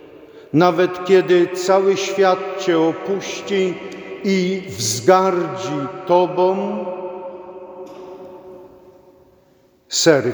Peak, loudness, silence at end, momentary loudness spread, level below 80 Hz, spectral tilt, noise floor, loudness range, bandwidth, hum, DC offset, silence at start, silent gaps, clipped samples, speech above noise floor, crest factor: 0 dBFS; -18 LUFS; 0 s; 21 LU; -66 dBFS; -4.5 dB/octave; -55 dBFS; 9 LU; over 20 kHz; none; under 0.1%; 0.05 s; none; under 0.1%; 38 dB; 18 dB